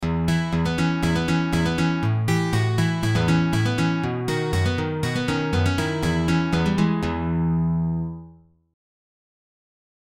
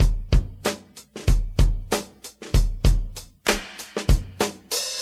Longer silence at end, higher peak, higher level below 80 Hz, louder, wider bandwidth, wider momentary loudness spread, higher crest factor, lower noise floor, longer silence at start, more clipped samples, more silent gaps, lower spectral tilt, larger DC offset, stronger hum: first, 1.7 s vs 0 s; second, -8 dBFS vs -4 dBFS; second, -40 dBFS vs -24 dBFS; first, -22 LUFS vs -25 LUFS; about the same, 14.5 kHz vs 15 kHz; second, 4 LU vs 12 LU; about the same, 14 dB vs 18 dB; first, -49 dBFS vs -42 dBFS; about the same, 0 s vs 0 s; neither; neither; first, -6.5 dB/octave vs -4.5 dB/octave; first, 0.1% vs under 0.1%; neither